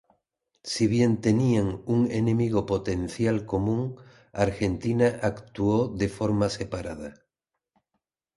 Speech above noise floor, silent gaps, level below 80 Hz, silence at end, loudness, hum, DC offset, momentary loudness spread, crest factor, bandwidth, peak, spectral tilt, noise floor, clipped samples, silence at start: 60 dB; none; -48 dBFS; 1.25 s; -26 LUFS; none; under 0.1%; 11 LU; 18 dB; 11.5 kHz; -8 dBFS; -7 dB/octave; -85 dBFS; under 0.1%; 0.65 s